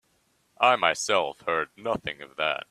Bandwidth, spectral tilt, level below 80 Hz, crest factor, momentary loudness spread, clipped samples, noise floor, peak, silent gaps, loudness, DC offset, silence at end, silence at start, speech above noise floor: 14 kHz; -2 dB/octave; -64 dBFS; 22 dB; 10 LU; under 0.1%; -69 dBFS; -4 dBFS; none; -26 LUFS; under 0.1%; 0.05 s; 0.6 s; 42 dB